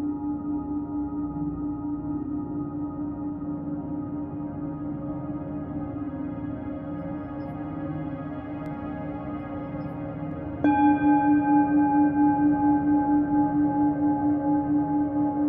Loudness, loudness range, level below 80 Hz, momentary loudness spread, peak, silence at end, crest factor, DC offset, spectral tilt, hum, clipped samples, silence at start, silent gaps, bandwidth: -26 LUFS; 12 LU; -50 dBFS; 13 LU; -10 dBFS; 0 s; 16 dB; under 0.1%; -9 dB/octave; none; under 0.1%; 0 s; none; 3.6 kHz